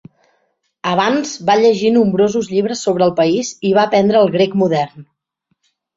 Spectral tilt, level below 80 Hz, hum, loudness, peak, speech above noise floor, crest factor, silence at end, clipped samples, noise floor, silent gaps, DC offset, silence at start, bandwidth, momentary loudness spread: -5.5 dB/octave; -58 dBFS; none; -15 LUFS; -2 dBFS; 55 dB; 14 dB; 0.95 s; under 0.1%; -69 dBFS; none; under 0.1%; 0.85 s; 8 kHz; 6 LU